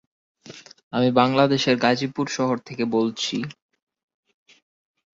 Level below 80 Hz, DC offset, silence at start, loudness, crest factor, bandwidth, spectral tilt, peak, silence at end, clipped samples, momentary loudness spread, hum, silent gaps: -64 dBFS; under 0.1%; 0.45 s; -22 LUFS; 20 dB; 7.8 kHz; -5 dB/octave; -4 dBFS; 1.6 s; under 0.1%; 12 LU; none; 0.83-0.91 s